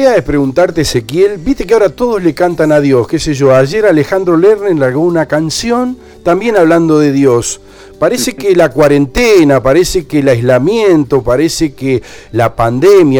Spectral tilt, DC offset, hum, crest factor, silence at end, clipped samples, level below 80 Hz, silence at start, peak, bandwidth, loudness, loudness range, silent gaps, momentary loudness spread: -5.5 dB/octave; under 0.1%; none; 10 dB; 0 s; 0.2%; -32 dBFS; 0 s; 0 dBFS; 19.5 kHz; -10 LUFS; 2 LU; none; 6 LU